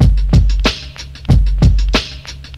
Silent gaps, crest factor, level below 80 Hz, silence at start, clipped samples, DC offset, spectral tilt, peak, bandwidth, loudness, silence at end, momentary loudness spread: none; 12 dB; -14 dBFS; 0 s; under 0.1%; under 0.1%; -6 dB/octave; 0 dBFS; 8.4 kHz; -14 LUFS; 0 s; 15 LU